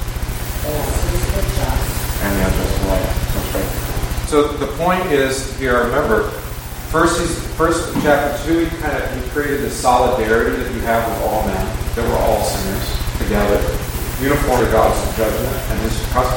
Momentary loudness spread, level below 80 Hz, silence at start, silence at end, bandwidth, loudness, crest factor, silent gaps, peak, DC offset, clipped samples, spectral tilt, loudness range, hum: 7 LU; -24 dBFS; 0 s; 0 s; 17 kHz; -18 LUFS; 18 dB; none; 0 dBFS; under 0.1%; under 0.1%; -5 dB/octave; 2 LU; none